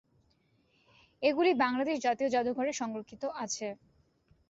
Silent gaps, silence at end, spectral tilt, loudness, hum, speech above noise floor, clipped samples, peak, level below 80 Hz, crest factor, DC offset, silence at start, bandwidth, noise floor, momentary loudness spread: none; 0.75 s; -3 dB/octave; -31 LUFS; none; 40 dB; under 0.1%; -14 dBFS; -74 dBFS; 18 dB; under 0.1%; 1.2 s; 8 kHz; -71 dBFS; 12 LU